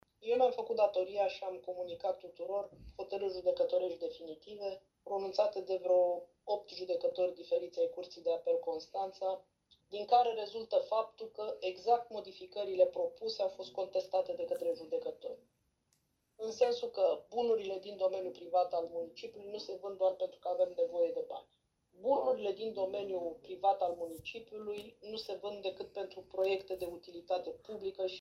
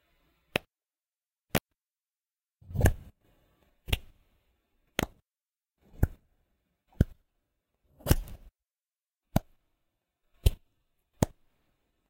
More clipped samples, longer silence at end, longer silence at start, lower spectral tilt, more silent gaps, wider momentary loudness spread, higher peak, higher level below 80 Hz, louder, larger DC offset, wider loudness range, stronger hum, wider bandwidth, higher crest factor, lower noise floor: neither; second, 0 s vs 0.85 s; second, 0.2 s vs 0.55 s; about the same, -4.5 dB/octave vs -5.5 dB/octave; neither; about the same, 13 LU vs 11 LU; second, -16 dBFS vs -6 dBFS; second, -74 dBFS vs -40 dBFS; second, -36 LUFS vs -33 LUFS; neither; about the same, 4 LU vs 3 LU; neither; second, 13 kHz vs 16 kHz; second, 20 dB vs 28 dB; second, -78 dBFS vs under -90 dBFS